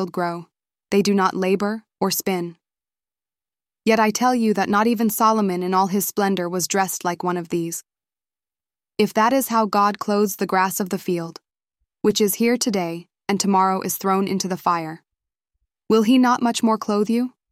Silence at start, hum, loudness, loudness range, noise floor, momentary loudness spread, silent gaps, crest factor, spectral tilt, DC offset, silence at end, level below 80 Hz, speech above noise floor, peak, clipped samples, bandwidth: 0 s; none; -20 LUFS; 4 LU; under -90 dBFS; 8 LU; none; 18 dB; -4.5 dB/octave; under 0.1%; 0.2 s; -66 dBFS; over 70 dB; -4 dBFS; under 0.1%; 16 kHz